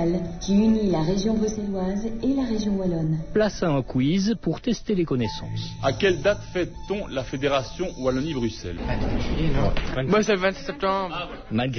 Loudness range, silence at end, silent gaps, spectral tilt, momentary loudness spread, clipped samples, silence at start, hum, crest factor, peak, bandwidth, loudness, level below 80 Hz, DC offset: 3 LU; 0 s; none; -6 dB/octave; 8 LU; under 0.1%; 0 s; none; 16 dB; -8 dBFS; 6.6 kHz; -25 LUFS; -36 dBFS; under 0.1%